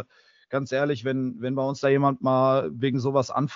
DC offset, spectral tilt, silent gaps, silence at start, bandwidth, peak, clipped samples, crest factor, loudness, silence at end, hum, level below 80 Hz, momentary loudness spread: under 0.1%; -6 dB/octave; none; 0 s; 7.4 kHz; -8 dBFS; under 0.1%; 18 dB; -25 LUFS; 0 s; none; -68 dBFS; 7 LU